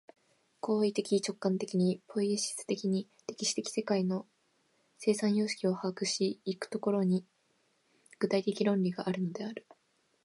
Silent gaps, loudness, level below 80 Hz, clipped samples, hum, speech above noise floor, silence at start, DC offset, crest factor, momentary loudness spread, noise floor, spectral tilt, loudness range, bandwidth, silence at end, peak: none; -33 LUFS; -82 dBFS; under 0.1%; none; 41 dB; 0.65 s; under 0.1%; 18 dB; 7 LU; -73 dBFS; -5 dB/octave; 1 LU; 11.5 kHz; 0.65 s; -16 dBFS